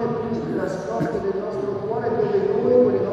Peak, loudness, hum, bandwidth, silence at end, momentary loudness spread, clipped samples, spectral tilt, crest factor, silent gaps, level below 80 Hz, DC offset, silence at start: -4 dBFS; -22 LUFS; none; 8.2 kHz; 0 s; 9 LU; under 0.1%; -8 dB/octave; 16 dB; none; -54 dBFS; under 0.1%; 0 s